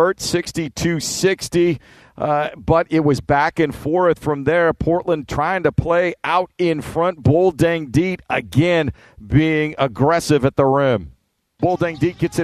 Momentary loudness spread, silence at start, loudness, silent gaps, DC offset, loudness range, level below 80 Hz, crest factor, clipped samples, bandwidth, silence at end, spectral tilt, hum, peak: 5 LU; 0 s; -18 LUFS; none; under 0.1%; 1 LU; -42 dBFS; 16 dB; under 0.1%; 14 kHz; 0 s; -6 dB/octave; none; 0 dBFS